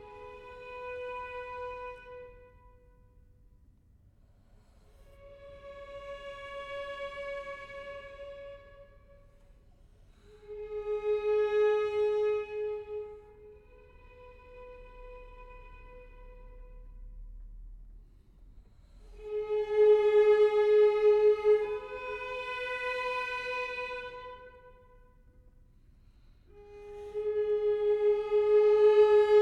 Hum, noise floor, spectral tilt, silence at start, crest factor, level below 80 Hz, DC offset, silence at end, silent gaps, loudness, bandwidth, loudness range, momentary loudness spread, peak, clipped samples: none; -62 dBFS; -5 dB/octave; 0 s; 18 dB; -56 dBFS; under 0.1%; 0 s; none; -29 LUFS; 6.2 kHz; 25 LU; 27 LU; -14 dBFS; under 0.1%